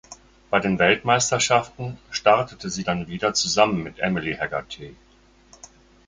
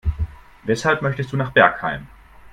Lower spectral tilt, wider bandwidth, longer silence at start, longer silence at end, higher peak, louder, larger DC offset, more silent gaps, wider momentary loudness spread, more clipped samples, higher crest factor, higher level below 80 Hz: second, -3.5 dB/octave vs -6 dB/octave; second, 9.8 kHz vs 12.5 kHz; about the same, 0.1 s vs 0.05 s; first, 1.15 s vs 0.05 s; about the same, -2 dBFS vs 0 dBFS; second, -22 LUFS vs -19 LUFS; neither; neither; second, 13 LU vs 16 LU; neither; about the same, 22 dB vs 20 dB; second, -52 dBFS vs -34 dBFS